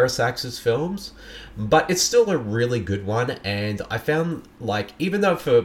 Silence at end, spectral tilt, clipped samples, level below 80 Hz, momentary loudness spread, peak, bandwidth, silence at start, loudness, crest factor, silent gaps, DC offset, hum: 0 s; -4.5 dB/octave; under 0.1%; -48 dBFS; 12 LU; -4 dBFS; 16.5 kHz; 0 s; -22 LUFS; 18 dB; none; under 0.1%; none